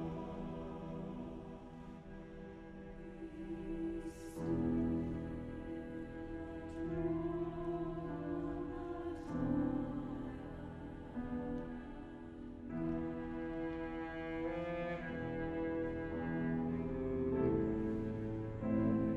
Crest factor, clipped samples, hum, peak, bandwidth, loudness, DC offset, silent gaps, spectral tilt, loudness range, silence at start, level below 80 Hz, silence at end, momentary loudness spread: 18 dB; under 0.1%; none; -22 dBFS; 11.5 kHz; -41 LUFS; under 0.1%; none; -9 dB/octave; 7 LU; 0 s; -54 dBFS; 0 s; 14 LU